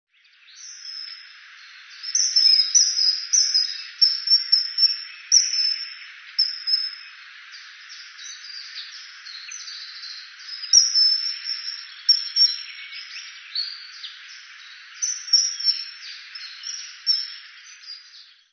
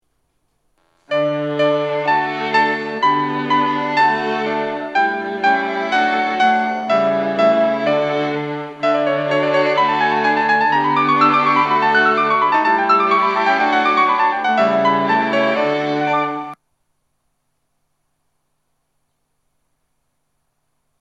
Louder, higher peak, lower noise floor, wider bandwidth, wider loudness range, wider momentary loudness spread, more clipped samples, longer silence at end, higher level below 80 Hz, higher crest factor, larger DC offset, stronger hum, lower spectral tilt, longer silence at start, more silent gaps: about the same, -18 LUFS vs -16 LUFS; second, -4 dBFS vs 0 dBFS; second, -52 dBFS vs -71 dBFS; second, 6.6 kHz vs 8.8 kHz; first, 10 LU vs 5 LU; first, 24 LU vs 6 LU; neither; second, 0.3 s vs 4.45 s; second, under -90 dBFS vs -70 dBFS; first, 22 dB vs 16 dB; neither; neither; second, 14 dB/octave vs -5.5 dB/octave; second, 0.55 s vs 1.1 s; neither